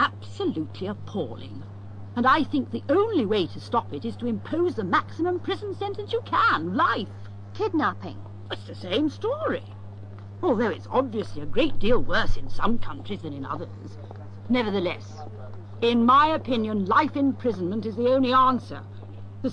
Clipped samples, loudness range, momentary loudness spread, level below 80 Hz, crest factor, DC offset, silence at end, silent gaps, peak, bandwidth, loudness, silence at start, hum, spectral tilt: under 0.1%; 6 LU; 19 LU; -40 dBFS; 18 dB; 0.4%; 0 s; none; -8 dBFS; 7 kHz; -25 LUFS; 0 s; none; -7 dB/octave